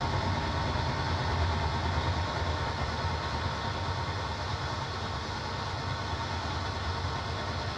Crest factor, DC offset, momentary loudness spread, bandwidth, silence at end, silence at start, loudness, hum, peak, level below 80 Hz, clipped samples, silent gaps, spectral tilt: 14 dB; under 0.1%; 4 LU; 9.8 kHz; 0 s; 0 s; -32 LUFS; none; -16 dBFS; -42 dBFS; under 0.1%; none; -5 dB/octave